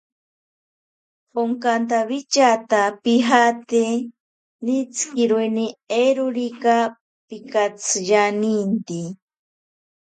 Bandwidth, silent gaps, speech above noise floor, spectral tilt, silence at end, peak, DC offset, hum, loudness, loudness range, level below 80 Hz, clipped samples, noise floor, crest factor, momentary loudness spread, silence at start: 9.4 kHz; 4.20-4.59 s, 7.01-7.28 s; over 71 dB; -3.5 dB/octave; 0.95 s; 0 dBFS; under 0.1%; none; -20 LUFS; 3 LU; -74 dBFS; under 0.1%; under -90 dBFS; 20 dB; 11 LU; 1.35 s